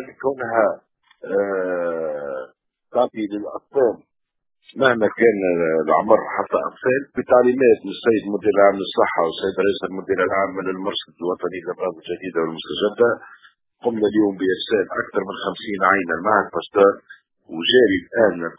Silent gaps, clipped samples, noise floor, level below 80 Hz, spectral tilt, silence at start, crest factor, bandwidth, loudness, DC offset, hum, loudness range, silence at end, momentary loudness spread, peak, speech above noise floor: none; under 0.1%; -50 dBFS; -58 dBFS; -9 dB/octave; 0 s; 20 dB; 4 kHz; -20 LUFS; under 0.1%; none; 6 LU; 0.05 s; 11 LU; 0 dBFS; 30 dB